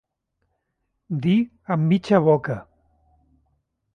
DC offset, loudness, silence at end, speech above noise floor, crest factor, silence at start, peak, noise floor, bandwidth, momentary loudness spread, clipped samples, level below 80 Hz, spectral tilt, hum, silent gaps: under 0.1%; -21 LUFS; 1.35 s; 56 dB; 20 dB; 1.1 s; -4 dBFS; -76 dBFS; 8.8 kHz; 13 LU; under 0.1%; -60 dBFS; -8.5 dB/octave; none; none